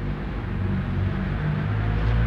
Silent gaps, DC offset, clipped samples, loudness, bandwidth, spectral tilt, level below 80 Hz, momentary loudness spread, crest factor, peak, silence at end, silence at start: none; under 0.1%; under 0.1%; -26 LUFS; 5.6 kHz; -9 dB/octave; -30 dBFS; 5 LU; 12 dB; -12 dBFS; 0 s; 0 s